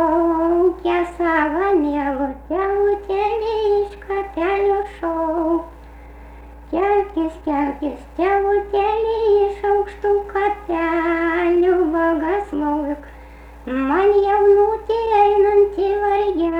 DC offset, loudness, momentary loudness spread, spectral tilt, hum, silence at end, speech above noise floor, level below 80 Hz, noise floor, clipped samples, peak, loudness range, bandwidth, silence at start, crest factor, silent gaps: under 0.1%; -19 LUFS; 8 LU; -7 dB/octave; none; 0 s; 22 dB; -40 dBFS; -39 dBFS; under 0.1%; -6 dBFS; 5 LU; 5.8 kHz; 0 s; 14 dB; none